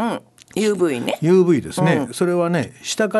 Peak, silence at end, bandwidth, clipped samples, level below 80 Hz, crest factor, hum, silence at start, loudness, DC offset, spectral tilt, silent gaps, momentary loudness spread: -2 dBFS; 0 s; 12.5 kHz; under 0.1%; -56 dBFS; 16 dB; none; 0 s; -19 LUFS; under 0.1%; -5.5 dB/octave; none; 10 LU